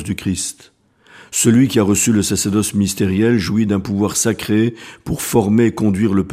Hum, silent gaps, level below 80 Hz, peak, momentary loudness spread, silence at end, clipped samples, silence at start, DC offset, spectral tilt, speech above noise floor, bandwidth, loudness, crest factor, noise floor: none; none; -44 dBFS; 0 dBFS; 9 LU; 0 s; under 0.1%; 0 s; under 0.1%; -5 dB/octave; 30 dB; 15.5 kHz; -16 LUFS; 16 dB; -46 dBFS